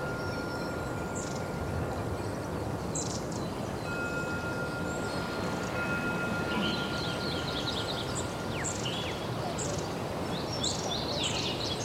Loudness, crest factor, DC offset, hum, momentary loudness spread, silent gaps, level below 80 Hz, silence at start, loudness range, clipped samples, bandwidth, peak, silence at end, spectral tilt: -33 LUFS; 14 dB; under 0.1%; none; 5 LU; none; -50 dBFS; 0 s; 3 LU; under 0.1%; 16 kHz; -18 dBFS; 0 s; -4 dB/octave